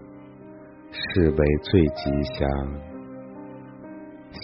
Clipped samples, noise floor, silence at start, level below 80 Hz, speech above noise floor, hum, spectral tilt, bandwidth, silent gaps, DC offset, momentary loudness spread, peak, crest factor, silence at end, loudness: under 0.1%; -44 dBFS; 0 s; -36 dBFS; 22 dB; none; -6 dB/octave; 5.8 kHz; none; under 0.1%; 24 LU; -4 dBFS; 20 dB; 0 s; -23 LUFS